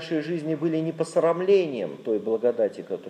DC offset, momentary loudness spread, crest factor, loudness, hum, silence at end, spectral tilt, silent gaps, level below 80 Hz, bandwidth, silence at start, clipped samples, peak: under 0.1%; 7 LU; 16 dB; -25 LUFS; none; 0 s; -7 dB/octave; none; -82 dBFS; 10.5 kHz; 0 s; under 0.1%; -10 dBFS